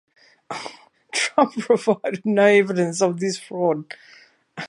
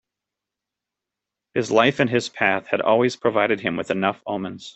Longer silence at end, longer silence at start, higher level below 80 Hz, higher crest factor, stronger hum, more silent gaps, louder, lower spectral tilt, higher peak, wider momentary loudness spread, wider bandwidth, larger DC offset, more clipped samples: about the same, 0 s vs 0.05 s; second, 0.5 s vs 1.55 s; second, -74 dBFS vs -64 dBFS; about the same, 20 dB vs 20 dB; neither; neither; about the same, -20 LUFS vs -21 LUFS; about the same, -4.5 dB/octave vs -5 dB/octave; about the same, -2 dBFS vs -2 dBFS; first, 20 LU vs 10 LU; first, 11.5 kHz vs 8.4 kHz; neither; neither